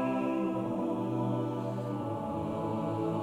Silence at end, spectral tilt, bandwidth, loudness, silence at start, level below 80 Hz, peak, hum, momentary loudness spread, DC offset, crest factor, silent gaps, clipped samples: 0 s; -8.5 dB/octave; 12.5 kHz; -33 LUFS; 0 s; -64 dBFS; -20 dBFS; none; 4 LU; under 0.1%; 12 dB; none; under 0.1%